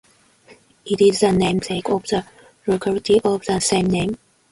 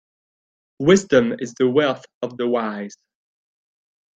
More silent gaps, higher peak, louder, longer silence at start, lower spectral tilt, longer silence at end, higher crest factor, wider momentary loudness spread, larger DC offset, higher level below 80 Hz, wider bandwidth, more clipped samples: second, none vs 2.14-2.21 s; about the same, -4 dBFS vs -2 dBFS; about the same, -19 LUFS vs -19 LUFS; second, 0.5 s vs 0.8 s; about the same, -5 dB/octave vs -5.5 dB/octave; second, 0.35 s vs 1.3 s; about the same, 16 dB vs 20 dB; second, 10 LU vs 15 LU; neither; first, -48 dBFS vs -60 dBFS; first, 11.5 kHz vs 9 kHz; neither